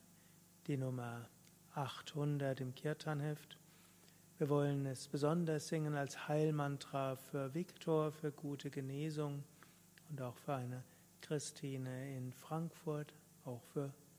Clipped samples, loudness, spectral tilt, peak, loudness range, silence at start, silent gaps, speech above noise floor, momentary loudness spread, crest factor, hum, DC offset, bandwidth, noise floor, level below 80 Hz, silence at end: under 0.1%; -42 LUFS; -6.5 dB/octave; -24 dBFS; 7 LU; 0.1 s; none; 25 dB; 14 LU; 18 dB; 50 Hz at -65 dBFS; under 0.1%; 16 kHz; -66 dBFS; -82 dBFS; 0.1 s